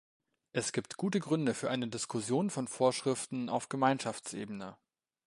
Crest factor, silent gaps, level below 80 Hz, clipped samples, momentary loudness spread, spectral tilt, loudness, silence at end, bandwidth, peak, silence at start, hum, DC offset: 20 dB; none; -76 dBFS; under 0.1%; 10 LU; -4.5 dB/octave; -34 LUFS; 0.55 s; 11.5 kHz; -14 dBFS; 0.55 s; none; under 0.1%